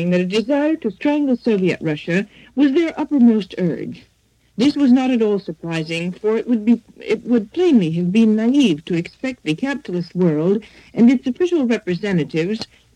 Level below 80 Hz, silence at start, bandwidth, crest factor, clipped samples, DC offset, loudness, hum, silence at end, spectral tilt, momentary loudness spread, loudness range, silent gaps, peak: -58 dBFS; 0 s; 9.4 kHz; 14 dB; under 0.1%; under 0.1%; -18 LUFS; none; 0.3 s; -7 dB/octave; 9 LU; 2 LU; none; -4 dBFS